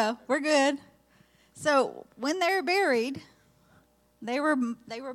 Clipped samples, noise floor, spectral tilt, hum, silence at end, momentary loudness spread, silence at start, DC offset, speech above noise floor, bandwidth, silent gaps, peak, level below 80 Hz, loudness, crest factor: under 0.1%; -63 dBFS; -3 dB/octave; none; 0 s; 12 LU; 0 s; under 0.1%; 36 dB; 15.5 kHz; none; -12 dBFS; -74 dBFS; -27 LUFS; 18 dB